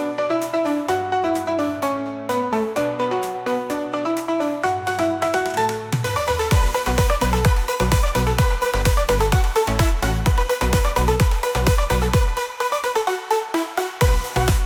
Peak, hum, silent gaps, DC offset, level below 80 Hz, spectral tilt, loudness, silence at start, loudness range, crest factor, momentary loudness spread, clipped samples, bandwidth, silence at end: -6 dBFS; none; none; under 0.1%; -24 dBFS; -5 dB/octave; -21 LUFS; 0 s; 3 LU; 14 dB; 5 LU; under 0.1%; 20 kHz; 0 s